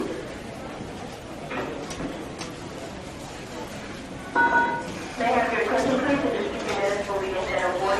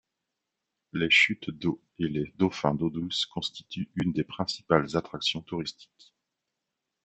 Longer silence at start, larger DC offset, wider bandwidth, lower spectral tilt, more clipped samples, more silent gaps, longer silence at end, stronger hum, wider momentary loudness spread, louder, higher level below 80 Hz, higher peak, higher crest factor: second, 0 s vs 0.95 s; neither; first, 14 kHz vs 8.2 kHz; about the same, -4.5 dB/octave vs -5 dB/octave; neither; neither; second, 0 s vs 1.2 s; neither; about the same, 14 LU vs 14 LU; about the same, -27 LUFS vs -28 LUFS; first, -50 dBFS vs -62 dBFS; second, -10 dBFS vs -6 dBFS; second, 18 dB vs 24 dB